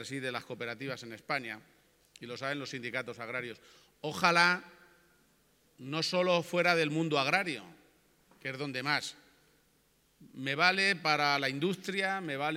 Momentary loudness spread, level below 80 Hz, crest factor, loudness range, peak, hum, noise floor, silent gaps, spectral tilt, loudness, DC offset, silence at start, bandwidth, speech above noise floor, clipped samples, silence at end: 16 LU; -78 dBFS; 26 dB; 8 LU; -8 dBFS; none; -70 dBFS; none; -4 dB/octave; -31 LUFS; under 0.1%; 0 s; 16.5 kHz; 37 dB; under 0.1%; 0 s